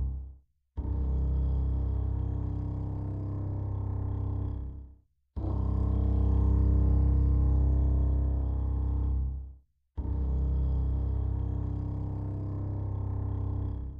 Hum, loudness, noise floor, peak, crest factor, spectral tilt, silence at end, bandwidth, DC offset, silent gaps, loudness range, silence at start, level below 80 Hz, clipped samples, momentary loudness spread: none; -31 LUFS; -57 dBFS; -16 dBFS; 12 dB; -12 dB/octave; 0 s; 1.8 kHz; under 0.1%; none; 6 LU; 0 s; -30 dBFS; under 0.1%; 11 LU